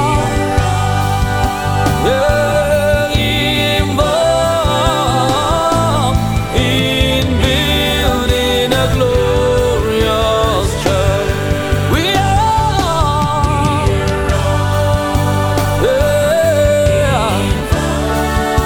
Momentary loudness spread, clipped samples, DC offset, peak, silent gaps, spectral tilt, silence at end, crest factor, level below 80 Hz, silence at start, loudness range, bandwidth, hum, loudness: 3 LU; under 0.1%; under 0.1%; 0 dBFS; none; -5 dB/octave; 0 s; 12 dB; -22 dBFS; 0 s; 1 LU; 18.5 kHz; none; -13 LUFS